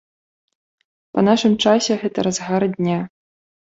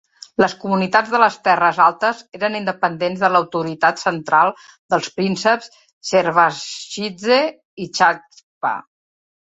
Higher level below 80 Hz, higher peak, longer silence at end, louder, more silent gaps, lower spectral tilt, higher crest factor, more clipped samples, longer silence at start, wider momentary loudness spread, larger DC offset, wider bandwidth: about the same, -60 dBFS vs -64 dBFS; about the same, -2 dBFS vs 0 dBFS; second, 0.6 s vs 0.75 s; about the same, -18 LUFS vs -18 LUFS; second, none vs 4.78-4.89 s, 5.93-6.01 s, 7.65-7.77 s, 8.43-8.61 s; about the same, -5 dB/octave vs -4 dB/octave; about the same, 18 dB vs 18 dB; neither; first, 1.15 s vs 0.4 s; about the same, 9 LU vs 11 LU; neither; about the same, 8 kHz vs 8.2 kHz